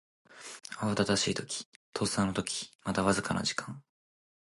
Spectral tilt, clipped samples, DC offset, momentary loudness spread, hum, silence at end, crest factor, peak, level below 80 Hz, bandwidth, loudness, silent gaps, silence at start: -4 dB/octave; under 0.1%; under 0.1%; 17 LU; none; 0.7 s; 22 dB; -12 dBFS; -58 dBFS; 11.5 kHz; -32 LUFS; 1.65-1.93 s, 2.75-2.79 s; 0.3 s